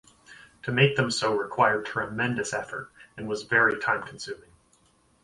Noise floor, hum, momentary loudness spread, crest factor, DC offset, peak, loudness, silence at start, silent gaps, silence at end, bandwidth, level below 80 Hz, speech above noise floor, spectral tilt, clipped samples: -64 dBFS; none; 16 LU; 22 dB; under 0.1%; -6 dBFS; -25 LUFS; 0.3 s; none; 0.85 s; 11.5 kHz; -62 dBFS; 37 dB; -4.5 dB/octave; under 0.1%